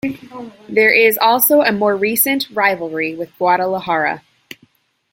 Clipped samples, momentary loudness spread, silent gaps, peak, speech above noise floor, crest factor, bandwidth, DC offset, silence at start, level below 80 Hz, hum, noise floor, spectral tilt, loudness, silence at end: under 0.1%; 14 LU; none; 0 dBFS; 40 dB; 16 dB; 16.5 kHz; under 0.1%; 0.05 s; -62 dBFS; none; -56 dBFS; -3 dB/octave; -15 LUFS; 0.95 s